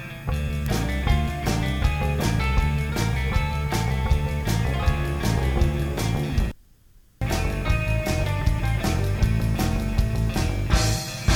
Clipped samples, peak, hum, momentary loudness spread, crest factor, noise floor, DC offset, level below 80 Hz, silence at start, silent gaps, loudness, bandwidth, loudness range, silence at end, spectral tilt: under 0.1%; -6 dBFS; none; 3 LU; 18 dB; -53 dBFS; under 0.1%; -26 dBFS; 0 s; none; -24 LUFS; 19 kHz; 2 LU; 0 s; -5.5 dB/octave